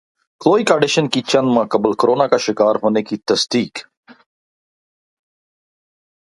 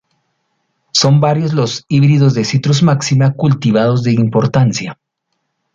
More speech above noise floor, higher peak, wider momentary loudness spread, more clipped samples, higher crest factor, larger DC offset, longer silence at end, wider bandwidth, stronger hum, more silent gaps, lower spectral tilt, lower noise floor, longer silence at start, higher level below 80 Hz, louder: first, over 74 dB vs 59 dB; about the same, 0 dBFS vs 0 dBFS; about the same, 6 LU vs 5 LU; neither; first, 18 dB vs 12 dB; neither; first, 2.5 s vs 0.8 s; first, 11.5 kHz vs 7.8 kHz; neither; neither; second, -4.5 dB/octave vs -6 dB/octave; first, under -90 dBFS vs -70 dBFS; second, 0.4 s vs 0.95 s; second, -62 dBFS vs -50 dBFS; second, -16 LUFS vs -13 LUFS